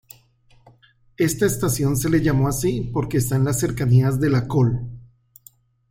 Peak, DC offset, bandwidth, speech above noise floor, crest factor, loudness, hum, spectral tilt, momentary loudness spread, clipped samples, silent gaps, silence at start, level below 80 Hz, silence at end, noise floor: -6 dBFS; under 0.1%; 16.5 kHz; 36 dB; 16 dB; -20 LUFS; none; -6.5 dB/octave; 5 LU; under 0.1%; none; 1.2 s; -42 dBFS; 0.85 s; -55 dBFS